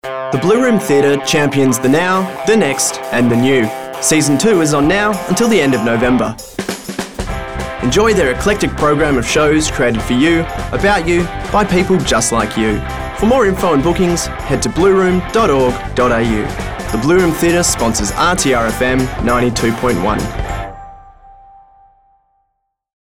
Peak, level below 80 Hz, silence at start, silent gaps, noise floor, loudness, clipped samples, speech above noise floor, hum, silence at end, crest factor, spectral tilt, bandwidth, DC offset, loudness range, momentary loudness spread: -4 dBFS; -30 dBFS; 0.05 s; none; -69 dBFS; -14 LUFS; under 0.1%; 56 dB; none; 1.75 s; 10 dB; -4.5 dB/octave; 18.5 kHz; 0.7%; 3 LU; 9 LU